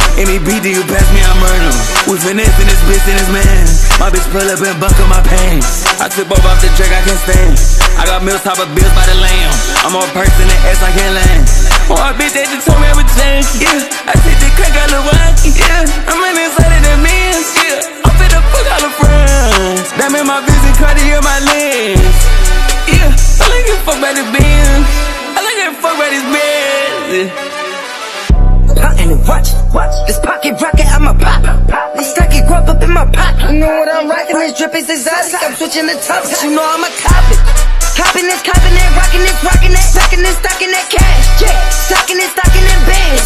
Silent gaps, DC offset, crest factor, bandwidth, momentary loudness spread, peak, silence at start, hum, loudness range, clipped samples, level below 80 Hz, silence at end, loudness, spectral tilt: none; under 0.1%; 6 dB; 13.5 kHz; 4 LU; 0 dBFS; 0 s; none; 3 LU; 0.6%; -8 dBFS; 0 s; -10 LUFS; -3.5 dB/octave